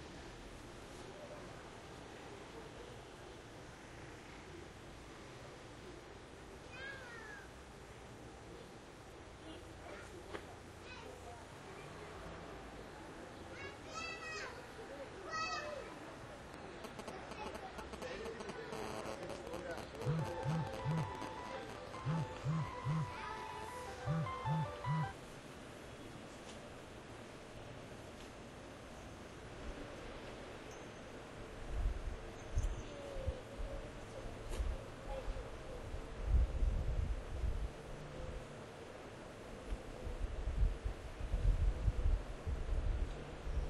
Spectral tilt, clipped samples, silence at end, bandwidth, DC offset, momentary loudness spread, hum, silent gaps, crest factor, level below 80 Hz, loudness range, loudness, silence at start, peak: -6 dB/octave; under 0.1%; 0 s; 12.5 kHz; under 0.1%; 13 LU; none; none; 20 dB; -46 dBFS; 11 LU; -46 LUFS; 0 s; -22 dBFS